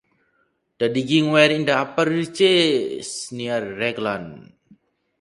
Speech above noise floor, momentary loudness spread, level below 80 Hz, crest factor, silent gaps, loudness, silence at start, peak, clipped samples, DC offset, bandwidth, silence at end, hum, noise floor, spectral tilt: 47 dB; 13 LU; -64 dBFS; 20 dB; none; -20 LUFS; 0.8 s; -2 dBFS; under 0.1%; under 0.1%; 11.5 kHz; 0.8 s; none; -67 dBFS; -4.5 dB/octave